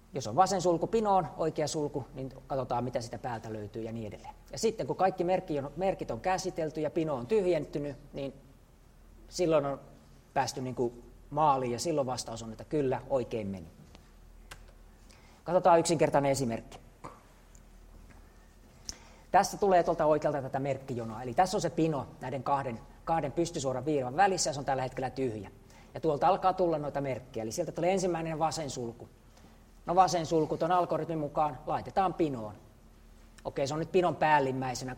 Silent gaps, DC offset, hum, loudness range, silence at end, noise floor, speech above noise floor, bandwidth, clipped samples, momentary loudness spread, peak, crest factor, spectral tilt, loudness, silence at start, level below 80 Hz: none; under 0.1%; none; 5 LU; 0 s; -58 dBFS; 27 dB; 16 kHz; under 0.1%; 16 LU; -10 dBFS; 22 dB; -5 dB/octave; -31 LUFS; 0.15 s; -56 dBFS